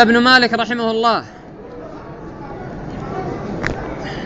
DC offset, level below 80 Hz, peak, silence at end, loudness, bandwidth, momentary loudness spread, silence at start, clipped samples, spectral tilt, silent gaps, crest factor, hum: under 0.1%; -40 dBFS; 0 dBFS; 0 s; -16 LUFS; 8 kHz; 22 LU; 0 s; under 0.1%; -5 dB/octave; none; 18 dB; none